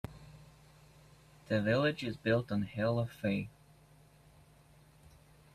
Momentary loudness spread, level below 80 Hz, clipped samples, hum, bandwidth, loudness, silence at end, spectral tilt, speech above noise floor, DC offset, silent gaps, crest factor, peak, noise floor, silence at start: 18 LU; -64 dBFS; under 0.1%; none; 14 kHz; -34 LUFS; 2.05 s; -7 dB/octave; 29 dB; under 0.1%; none; 20 dB; -18 dBFS; -62 dBFS; 0.05 s